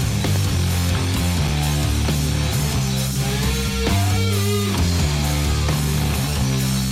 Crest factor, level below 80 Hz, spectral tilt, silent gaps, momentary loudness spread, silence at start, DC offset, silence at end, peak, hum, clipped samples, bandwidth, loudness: 10 dB; -26 dBFS; -4.5 dB/octave; none; 2 LU; 0 s; under 0.1%; 0 s; -10 dBFS; none; under 0.1%; 16.5 kHz; -20 LUFS